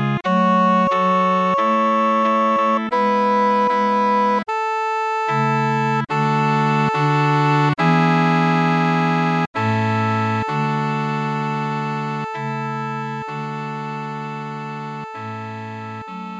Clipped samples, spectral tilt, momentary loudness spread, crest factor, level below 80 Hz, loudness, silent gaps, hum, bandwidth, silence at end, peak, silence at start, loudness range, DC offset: under 0.1%; -7 dB/octave; 12 LU; 14 dB; -64 dBFS; -19 LUFS; 9.47-9.54 s; none; 9.4 kHz; 0 s; -4 dBFS; 0 s; 9 LU; under 0.1%